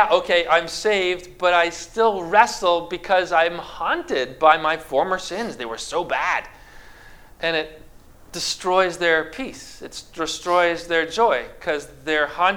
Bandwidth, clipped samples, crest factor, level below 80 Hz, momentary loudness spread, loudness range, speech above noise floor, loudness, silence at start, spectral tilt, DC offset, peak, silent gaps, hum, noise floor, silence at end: 17 kHz; under 0.1%; 22 dB; -50 dBFS; 11 LU; 6 LU; 24 dB; -21 LUFS; 0 s; -2.5 dB/octave; under 0.1%; 0 dBFS; none; none; -45 dBFS; 0 s